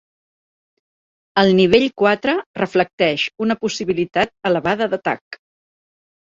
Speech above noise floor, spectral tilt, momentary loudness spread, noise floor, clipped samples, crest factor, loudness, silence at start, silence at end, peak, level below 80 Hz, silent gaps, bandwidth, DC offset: over 72 dB; -5.5 dB/octave; 8 LU; under -90 dBFS; under 0.1%; 18 dB; -18 LUFS; 1.35 s; 0.85 s; -2 dBFS; -54 dBFS; 2.46-2.54 s, 2.93-2.98 s, 5.21-5.31 s; 7.6 kHz; under 0.1%